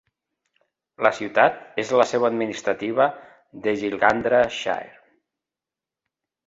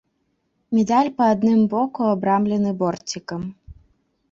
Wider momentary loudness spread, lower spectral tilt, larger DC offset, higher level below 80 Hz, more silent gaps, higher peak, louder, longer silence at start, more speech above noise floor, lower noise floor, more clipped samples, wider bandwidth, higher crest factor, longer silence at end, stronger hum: second, 8 LU vs 12 LU; second, -4.5 dB/octave vs -6.5 dB/octave; neither; second, -62 dBFS vs -54 dBFS; neither; first, -2 dBFS vs -6 dBFS; about the same, -22 LUFS vs -20 LUFS; first, 1 s vs 0.7 s; first, 68 dB vs 51 dB; first, -89 dBFS vs -70 dBFS; neither; about the same, 8 kHz vs 7.8 kHz; first, 22 dB vs 16 dB; first, 1.6 s vs 0.6 s; neither